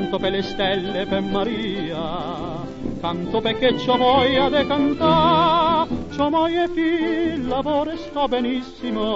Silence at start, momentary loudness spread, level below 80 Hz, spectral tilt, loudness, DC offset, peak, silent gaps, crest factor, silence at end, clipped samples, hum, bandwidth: 0 s; 11 LU; -42 dBFS; -6.5 dB/octave; -21 LUFS; under 0.1%; -4 dBFS; none; 16 dB; 0 s; under 0.1%; none; 7.8 kHz